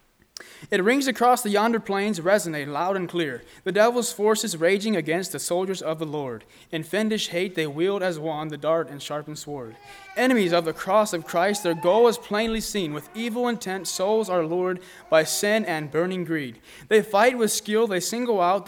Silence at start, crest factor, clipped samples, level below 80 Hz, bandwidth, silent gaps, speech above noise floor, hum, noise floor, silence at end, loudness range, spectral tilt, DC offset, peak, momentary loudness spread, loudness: 0.4 s; 20 dB; under 0.1%; -58 dBFS; 20 kHz; none; 22 dB; none; -46 dBFS; 0 s; 4 LU; -4 dB/octave; under 0.1%; -4 dBFS; 12 LU; -24 LUFS